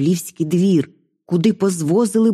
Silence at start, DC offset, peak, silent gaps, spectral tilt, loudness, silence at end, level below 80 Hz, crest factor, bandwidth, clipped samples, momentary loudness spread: 0 s; under 0.1%; -4 dBFS; none; -6.5 dB/octave; -18 LUFS; 0 s; -62 dBFS; 12 dB; 14.5 kHz; under 0.1%; 6 LU